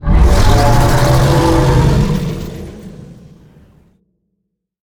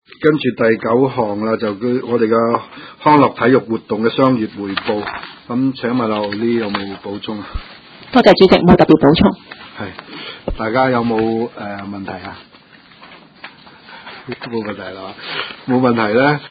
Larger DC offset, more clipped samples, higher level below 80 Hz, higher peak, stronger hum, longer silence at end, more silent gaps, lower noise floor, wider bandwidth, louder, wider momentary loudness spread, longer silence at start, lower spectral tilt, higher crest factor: neither; second, under 0.1% vs 0.1%; first, -16 dBFS vs -40 dBFS; about the same, 0 dBFS vs 0 dBFS; neither; first, 1.7 s vs 0 s; neither; first, -71 dBFS vs -44 dBFS; first, 19 kHz vs 8 kHz; first, -12 LUFS vs -15 LUFS; about the same, 19 LU vs 20 LU; second, 0 s vs 0.2 s; second, -6 dB/octave vs -8 dB/octave; about the same, 12 dB vs 16 dB